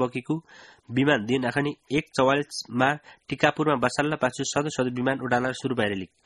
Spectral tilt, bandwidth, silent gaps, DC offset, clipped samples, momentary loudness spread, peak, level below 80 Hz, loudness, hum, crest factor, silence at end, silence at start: -5 dB/octave; 11.5 kHz; none; under 0.1%; under 0.1%; 8 LU; -2 dBFS; -58 dBFS; -25 LUFS; none; 22 dB; 0.2 s; 0 s